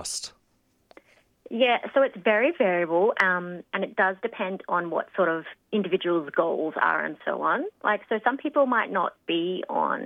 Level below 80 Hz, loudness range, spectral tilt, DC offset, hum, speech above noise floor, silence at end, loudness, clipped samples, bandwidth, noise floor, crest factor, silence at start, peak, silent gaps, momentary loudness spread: -74 dBFS; 3 LU; -4 dB/octave; under 0.1%; none; 43 dB; 0 s; -25 LUFS; under 0.1%; 14 kHz; -68 dBFS; 20 dB; 0 s; -4 dBFS; none; 8 LU